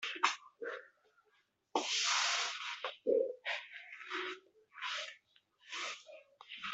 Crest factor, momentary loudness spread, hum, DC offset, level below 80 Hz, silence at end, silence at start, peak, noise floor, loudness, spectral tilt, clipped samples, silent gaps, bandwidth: 26 dB; 18 LU; none; under 0.1%; under -90 dBFS; 0 s; 0 s; -14 dBFS; -76 dBFS; -37 LUFS; 1 dB/octave; under 0.1%; none; 8.2 kHz